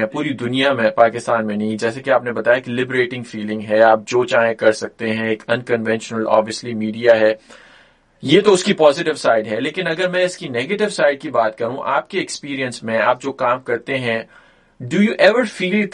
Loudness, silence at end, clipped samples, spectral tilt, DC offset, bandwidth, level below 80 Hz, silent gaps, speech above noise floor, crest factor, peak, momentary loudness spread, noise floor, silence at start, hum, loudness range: -17 LUFS; 0 s; under 0.1%; -5 dB/octave; under 0.1%; 11 kHz; -62 dBFS; none; 34 dB; 18 dB; 0 dBFS; 10 LU; -51 dBFS; 0 s; none; 3 LU